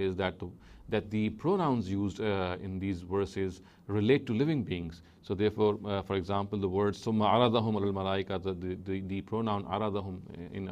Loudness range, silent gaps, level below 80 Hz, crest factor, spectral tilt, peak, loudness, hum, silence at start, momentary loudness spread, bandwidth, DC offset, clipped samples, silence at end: 3 LU; none; -58 dBFS; 20 dB; -7.5 dB/octave; -12 dBFS; -32 LUFS; none; 0 s; 10 LU; 9.6 kHz; under 0.1%; under 0.1%; 0 s